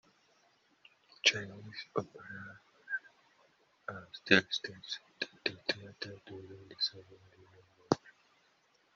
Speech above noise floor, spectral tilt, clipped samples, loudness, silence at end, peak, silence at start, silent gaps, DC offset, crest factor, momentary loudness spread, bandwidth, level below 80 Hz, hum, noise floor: 34 dB; -1.5 dB/octave; under 0.1%; -35 LUFS; 0.85 s; -6 dBFS; 1.25 s; none; under 0.1%; 32 dB; 21 LU; 7.4 kHz; -76 dBFS; none; -71 dBFS